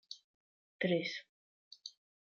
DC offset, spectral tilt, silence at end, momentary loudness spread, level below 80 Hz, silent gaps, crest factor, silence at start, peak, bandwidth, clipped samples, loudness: under 0.1%; -5.5 dB/octave; 0.35 s; 18 LU; -86 dBFS; 0.24-0.79 s, 1.29-1.71 s; 22 dB; 0.1 s; -20 dBFS; 7 kHz; under 0.1%; -37 LUFS